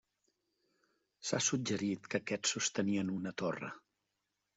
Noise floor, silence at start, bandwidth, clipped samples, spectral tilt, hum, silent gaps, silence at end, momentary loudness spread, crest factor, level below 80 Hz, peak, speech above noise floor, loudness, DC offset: -86 dBFS; 1.2 s; 8.2 kHz; under 0.1%; -3.5 dB/octave; none; none; 0.8 s; 11 LU; 20 dB; -78 dBFS; -18 dBFS; 50 dB; -36 LUFS; under 0.1%